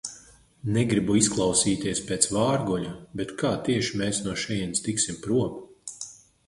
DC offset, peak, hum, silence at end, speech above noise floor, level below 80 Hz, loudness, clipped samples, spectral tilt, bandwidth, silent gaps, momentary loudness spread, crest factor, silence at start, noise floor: under 0.1%; -2 dBFS; none; 0.35 s; 27 dB; -52 dBFS; -25 LUFS; under 0.1%; -4 dB/octave; 11.5 kHz; none; 15 LU; 24 dB; 0.05 s; -53 dBFS